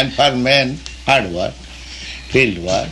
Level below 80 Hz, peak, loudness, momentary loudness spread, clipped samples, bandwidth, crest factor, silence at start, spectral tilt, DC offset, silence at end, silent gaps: -38 dBFS; -2 dBFS; -16 LUFS; 16 LU; under 0.1%; 12 kHz; 16 dB; 0 s; -4 dB/octave; under 0.1%; 0 s; none